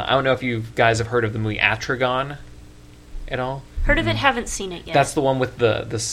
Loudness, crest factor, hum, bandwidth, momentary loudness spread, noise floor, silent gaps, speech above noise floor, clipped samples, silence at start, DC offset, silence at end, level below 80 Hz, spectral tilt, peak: -21 LUFS; 22 dB; none; 15 kHz; 10 LU; -43 dBFS; none; 23 dB; under 0.1%; 0 s; under 0.1%; 0 s; -34 dBFS; -4.5 dB/octave; 0 dBFS